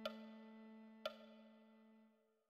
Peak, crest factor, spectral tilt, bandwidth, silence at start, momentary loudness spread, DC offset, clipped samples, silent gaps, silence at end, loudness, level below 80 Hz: -32 dBFS; 24 dB; -4.5 dB/octave; 14 kHz; 0 s; 16 LU; under 0.1%; under 0.1%; none; 0.15 s; -56 LUFS; under -90 dBFS